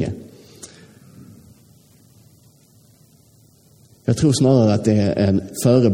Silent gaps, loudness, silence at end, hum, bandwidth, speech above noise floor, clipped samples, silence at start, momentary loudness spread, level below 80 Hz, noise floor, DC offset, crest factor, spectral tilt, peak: none; -17 LUFS; 0 s; none; 16.5 kHz; 37 dB; under 0.1%; 0 s; 25 LU; -50 dBFS; -53 dBFS; under 0.1%; 18 dB; -7 dB/octave; -4 dBFS